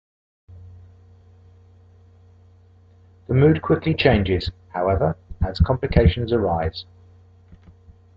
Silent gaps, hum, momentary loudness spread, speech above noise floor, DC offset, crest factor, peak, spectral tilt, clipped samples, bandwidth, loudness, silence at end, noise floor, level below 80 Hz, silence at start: none; none; 11 LU; 32 dB; under 0.1%; 20 dB; -2 dBFS; -9 dB/octave; under 0.1%; 5.8 kHz; -20 LUFS; 0.6 s; -51 dBFS; -34 dBFS; 0.5 s